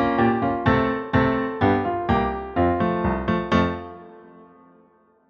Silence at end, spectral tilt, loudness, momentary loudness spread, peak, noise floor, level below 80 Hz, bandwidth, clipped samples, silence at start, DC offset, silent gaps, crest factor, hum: 0.85 s; -8.5 dB/octave; -22 LUFS; 5 LU; -6 dBFS; -58 dBFS; -40 dBFS; 6.8 kHz; under 0.1%; 0 s; under 0.1%; none; 16 dB; none